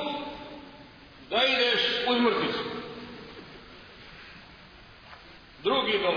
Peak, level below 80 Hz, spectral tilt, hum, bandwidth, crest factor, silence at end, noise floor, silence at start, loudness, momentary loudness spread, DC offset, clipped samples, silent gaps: -10 dBFS; -60 dBFS; -4.5 dB/octave; none; 5.4 kHz; 20 dB; 0 s; -51 dBFS; 0 s; -26 LUFS; 25 LU; under 0.1%; under 0.1%; none